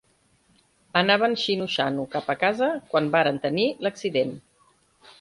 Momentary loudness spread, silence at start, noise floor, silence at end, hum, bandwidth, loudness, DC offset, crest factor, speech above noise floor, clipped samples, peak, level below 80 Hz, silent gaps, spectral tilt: 8 LU; 0.95 s; -64 dBFS; 0.8 s; none; 11.5 kHz; -24 LUFS; under 0.1%; 22 dB; 40 dB; under 0.1%; -4 dBFS; -66 dBFS; none; -5 dB/octave